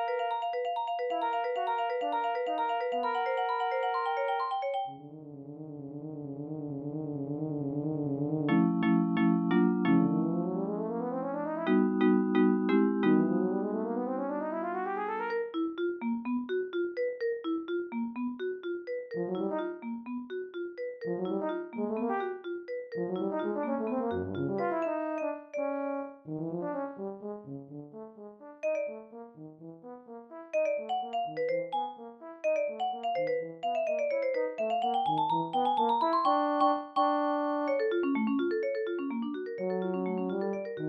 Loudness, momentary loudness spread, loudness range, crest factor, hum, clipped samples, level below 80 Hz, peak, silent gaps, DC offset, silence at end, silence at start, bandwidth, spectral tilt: -31 LUFS; 14 LU; 9 LU; 16 dB; none; under 0.1%; -78 dBFS; -14 dBFS; none; under 0.1%; 0 s; 0 s; 7.6 kHz; -8.5 dB/octave